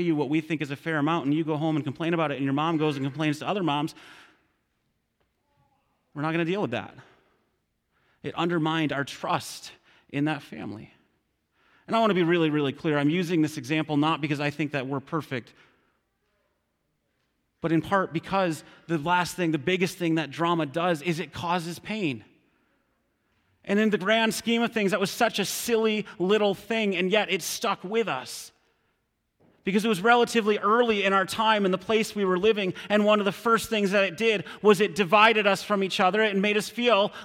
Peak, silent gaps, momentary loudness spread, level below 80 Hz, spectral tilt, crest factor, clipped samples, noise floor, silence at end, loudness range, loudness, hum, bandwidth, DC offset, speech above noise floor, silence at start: -6 dBFS; none; 9 LU; -66 dBFS; -5 dB/octave; 20 dB; under 0.1%; -75 dBFS; 0 s; 10 LU; -25 LUFS; none; 16.5 kHz; under 0.1%; 50 dB; 0 s